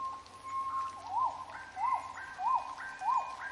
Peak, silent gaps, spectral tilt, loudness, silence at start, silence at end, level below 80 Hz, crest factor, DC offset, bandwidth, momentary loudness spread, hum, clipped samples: -20 dBFS; none; -2.5 dB/octave; -36 LUFS; 0 s; 0 s; -70 dBFS; 16 dB; under 0.1%; 11.5 kHz; 10 LU; none; under 0.1%